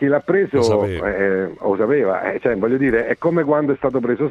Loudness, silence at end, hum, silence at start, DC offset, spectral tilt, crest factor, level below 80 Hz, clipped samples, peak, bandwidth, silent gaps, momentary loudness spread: -18 LUFS; 0 s; none; 0 s; under 0.1%; -7 dB/octave; 14 dB; -46 dBFS; under 0.1%; -4 dBFS; 11 kHz; none; 4 LU